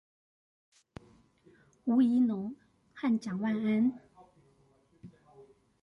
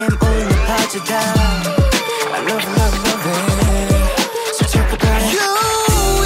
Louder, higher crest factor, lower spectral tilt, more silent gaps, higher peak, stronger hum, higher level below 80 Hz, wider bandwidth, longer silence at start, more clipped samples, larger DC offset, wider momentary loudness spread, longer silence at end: second, -30 LUFS vs -16 LUFS; first, 16 dB vs 10 dB; first, -7.5 dB/octave vs -4.5 dB/octave; neither; second, -18 dBFS vs -4 dBFS; neither; second, -72 dBFS vs -20 dBFS; second, 7.2 kHz vs 16.5 kHz; first, 1.85 s vs 0 s; neither; neither; first, 27 LU vs 3 LU; first, 0.4 s vs 0 s